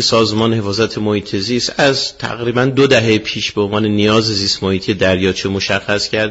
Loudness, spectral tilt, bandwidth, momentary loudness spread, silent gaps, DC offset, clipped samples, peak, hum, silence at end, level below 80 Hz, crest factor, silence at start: -15 LUFS; -4.5 dB/octave; 8 kHz; 6 LU; none; under 0.1%; under 0.1%; 0 dBFS; none; 0 s; -46 dBFS; 14 dB; 0 s